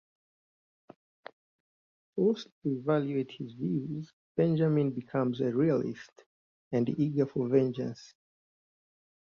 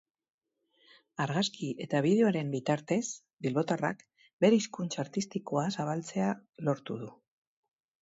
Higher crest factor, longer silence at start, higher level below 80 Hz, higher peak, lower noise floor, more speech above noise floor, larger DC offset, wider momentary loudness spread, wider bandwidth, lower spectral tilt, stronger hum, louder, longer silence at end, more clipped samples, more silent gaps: about the same, 20 dB vs 20 dB; first, 2.15 s vs 1.2 s; about the same, -72 dBFS vs -76 dBFS; about the same, -12 dBFS vs -12 dBFS; first, under -90 dBFS vs -74 dBFS; first, over 60 dB vs 43 dB; neither; about the same, 12 LU vs 12 LU; second, 7 kHz vs 8 kHz; first, -9 dB/octave vs -5.5 dB/octave; neither; about the same, -31 LUFS vs -31 LUFS; first, 1.3 s vs 0.9 s; neither; first, 2.52-2.62 s, 4.13-4.35 s, 6.26-6.71 s vs 3.33-3.37 s, 4.33-4.39 s